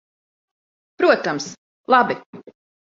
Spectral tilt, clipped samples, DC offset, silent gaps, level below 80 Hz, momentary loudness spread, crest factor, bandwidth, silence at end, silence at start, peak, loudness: -4 dB/octave; under 0.1%; under 0.1%; 1.58-1.84 s, 2.26-2.33 s; -70 dBFS; 15 LU; 20 dB; 7.8 kHz; 0.45 s; 1 s; -2 dBFS; -19 LUFS